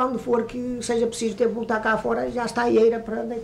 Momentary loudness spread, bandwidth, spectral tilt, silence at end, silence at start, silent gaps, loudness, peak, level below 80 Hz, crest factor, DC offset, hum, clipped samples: 9 LU; 12 kHz; -4.5 dB/octave; 0 s; 0 s; none; -23 LUFS; -10 dBFS; -52 dBFS; 14 dB; under 0.1%; none; under 0.1%